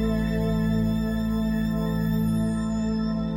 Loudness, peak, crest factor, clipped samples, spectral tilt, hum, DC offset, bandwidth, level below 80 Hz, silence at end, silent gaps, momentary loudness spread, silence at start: -25 LUFS; -14 dBFS; 10 dB; under 0.1%; -7.5 dB/octave; none; under 0.1%; 17 kHz; -34 dBFS; 0 s; none; 2 LU; 0 s